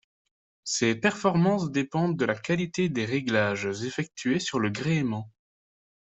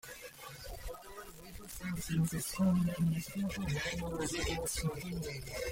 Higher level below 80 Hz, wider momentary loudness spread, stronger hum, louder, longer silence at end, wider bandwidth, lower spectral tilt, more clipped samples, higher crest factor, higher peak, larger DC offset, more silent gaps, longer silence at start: second, -64 dBFS vs -50 dBFS; second, 8 LU vs 16 LU; neither; first, -27 LUFS vs -36 LUFS; first, 0.8 s vs 0 s; second, 8.2 kHz vs 16.5 kHz; about the same, -5 dB/octave vs -5 dB/octave; neither; first, 20 dB vs 14 dB; first, -8 dBFS vs -24 dBFS; neither; neither; first, 0.65 s vs 0.05 s